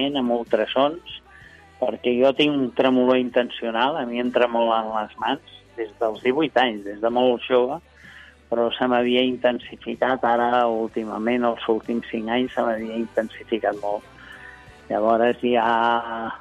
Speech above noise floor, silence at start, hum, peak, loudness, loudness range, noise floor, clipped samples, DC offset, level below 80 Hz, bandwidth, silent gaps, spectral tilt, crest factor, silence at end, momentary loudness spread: 26 dB; 0 s; none; -6 dBFS; -22 LUFS; 4 LU; -48 dBFS; under 0.1%; under 0.1%; -58 dBFS; 8.6 kHz; none; -6 dB/octave; 16 dB; 0 s; 11 LU